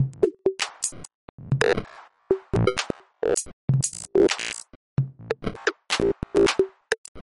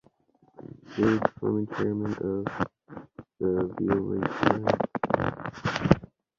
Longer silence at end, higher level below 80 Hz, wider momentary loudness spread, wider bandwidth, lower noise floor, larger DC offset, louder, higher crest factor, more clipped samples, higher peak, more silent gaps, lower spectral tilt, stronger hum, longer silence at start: second, 0.15 s vs 0.35 s; about the same, -46 dBFS vs -50 dBFS; second, 10 LU vs 17 LU; first, 11.5 kHz vs 7.4 kHz; second, -44 dBFS vs -64 dBFS; neither; first, -25 LUFS vs -28 LUFS; second, 20 dB vs 26 dB; neither; second, -6 dBFS vs -2 dBFS; first, 1.15-1.38 s, 3.53-3.68 s, 4.76-4.97 s, 6.98-7.15 s vs none; second, -4.5 dB/octave vs -7.5 dB/octave; neither; second, 0 s vs 0.6 s